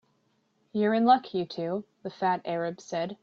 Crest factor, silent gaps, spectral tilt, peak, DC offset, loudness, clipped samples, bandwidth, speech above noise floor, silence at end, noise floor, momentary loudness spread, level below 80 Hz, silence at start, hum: 20 dB; none; -6 dB/octave; -8 dBFS; under 0.1%; -28 LUFS; under 0.1%; 7.4 kHz; 43 dB; 0.1 s; -71 dBFS; 12 LU; -74 dBFS; 0.75 s; none